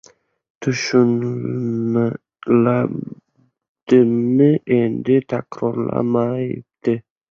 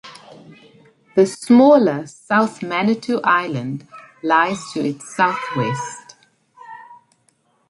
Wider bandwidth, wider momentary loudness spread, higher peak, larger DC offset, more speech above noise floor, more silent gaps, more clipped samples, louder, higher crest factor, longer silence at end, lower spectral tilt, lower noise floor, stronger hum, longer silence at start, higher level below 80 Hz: second, 7.2 kHz vs 11.5 kHz; second, 11 LU vs 18 LU; about the same, -2 dBFS vs -2 dBFS; neither; about the same, 45 dB vs 45 dB; first, 3.69-3.75 s vs none; neither; about the same, -19 LUFS vs -18 LUFS; about the same, 16 dB vs 18 dB; second, 0.3 s vs 0.75 s; first, -7.5 dB/octave vs -5.5 dB/octave; about the same, -62 dBFS vs -62 dBFS; neither; first, 0.6 s vs 0.05 s; first, -58 dBFS vs -66 dBFS